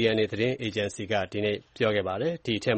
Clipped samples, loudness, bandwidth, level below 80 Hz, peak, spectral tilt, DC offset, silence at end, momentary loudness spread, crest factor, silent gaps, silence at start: under 0.1%; -28 LUFS; 8.4 kHz; -60 dBFS; -10 dBFS; -5.5 dB/octave; under 0.1%; 0 s; 4 LU; 18 dB; none; 0 s